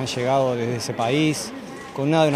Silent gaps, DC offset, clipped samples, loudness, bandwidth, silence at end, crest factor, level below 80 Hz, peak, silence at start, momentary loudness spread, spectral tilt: none; under 0.1%; under 0.1%; -22 LUFS; 15.5 kHz; 0 s; 16 dB; -60 dBFS; -4 dBFS; 0 s; 12 LU; -5 dB/octave